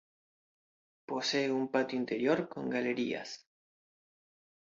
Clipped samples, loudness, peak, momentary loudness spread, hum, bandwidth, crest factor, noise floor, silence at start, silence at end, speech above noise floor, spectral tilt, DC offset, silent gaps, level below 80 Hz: under 0.1%; -33 LUFS; -16 dBFS; 10 LU; none; 7.6 kHz; 20 dB; under -90 dBFS; 1.1 s; 1.3 s; over 57 dB; -4.5 dB/octave; under 0.1%; none; -80 dBFS